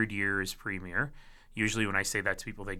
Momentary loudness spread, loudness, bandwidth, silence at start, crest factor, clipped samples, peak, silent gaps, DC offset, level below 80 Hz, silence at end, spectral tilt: 8 LU; -32 LUFS; 17.5 kHz; 0 s; 20 dB; under 0.1%; -14 dBFS; none; under 0.1%; -50 dBFS; 0 s; -3.5 dB/octave